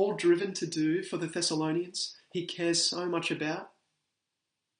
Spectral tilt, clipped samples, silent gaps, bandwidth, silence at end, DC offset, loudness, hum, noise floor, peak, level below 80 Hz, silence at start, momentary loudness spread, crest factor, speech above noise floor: -3.5 dB/octave; under 0.1%; none; 10 kHz; 1.1 s; under 0.1%; -30 LUFS; none; -85 dBFS; -14 dBFS; -78 dBFS; 0 s; 8 LU; 18 dB; 55 dB